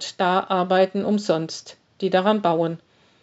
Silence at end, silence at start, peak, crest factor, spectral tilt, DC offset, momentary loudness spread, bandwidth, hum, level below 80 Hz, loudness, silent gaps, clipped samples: 0.45 s; 0 s; -4 dBFS; 18 dB; -4.5 dB/octave; under 0.1%; 11 LU; 8 kHz; none; -76 dBFS; -22 LUFS; none; under 0.1%